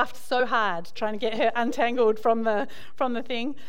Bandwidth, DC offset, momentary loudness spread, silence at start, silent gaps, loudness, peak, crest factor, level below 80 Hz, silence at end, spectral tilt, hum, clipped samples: 16.5 kHz; 3%; 8 LU; 0 s; none; -26 LUFS; -8 dBFS; 16 dB; -68 dBFS; 0.15 s; -4.5 dB/octave; none; under 0.1%